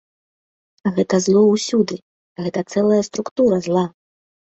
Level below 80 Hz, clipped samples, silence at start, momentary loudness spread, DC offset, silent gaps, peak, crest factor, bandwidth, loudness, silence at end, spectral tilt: -60 dBFS; under 0.1%; 0.85 s; 11 LU; under 0.1%; 2.02-2.36 s, 3.31-3.36 s; -4 dBFS; 16 dB; 8.2 kHz; -18 LUFS; 0.7 s; -6 dB/octave